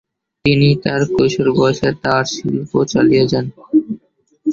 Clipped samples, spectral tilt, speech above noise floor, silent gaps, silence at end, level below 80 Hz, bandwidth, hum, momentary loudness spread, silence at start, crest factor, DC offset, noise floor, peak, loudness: under 0.1%; -6 dB/octave; 38 dB; none; 0 s; -46 dBFS; 7.6 kHz; none; 8 LU; 0.45 s; 14 dB; under 0.1%; -53 dBFS; -2 dBFS; -15 LUFS